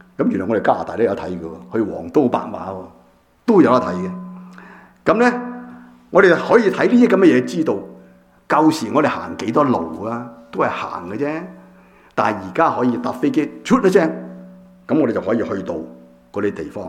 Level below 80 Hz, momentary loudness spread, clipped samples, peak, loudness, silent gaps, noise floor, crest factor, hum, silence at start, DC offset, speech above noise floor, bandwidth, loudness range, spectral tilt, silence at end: -56 dBFS; 17 LU; under 0.1%; 0 dBFS; -18 LUFS; none; -51 dBFS; 18 dB; none; 0.2 s; under 0.1%; 34 dB; 13.5 kHz; 6 LU; -6.5 dB/octave; 0 s